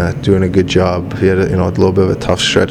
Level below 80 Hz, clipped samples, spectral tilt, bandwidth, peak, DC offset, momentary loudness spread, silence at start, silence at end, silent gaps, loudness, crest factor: -34 dBFS; under 0.1%; -6 dB/octave; 12 kHz; 0 dBFS; under 0.1%; 2 LU; 0 s; 0 s; none; -13 LUFS; 12 dB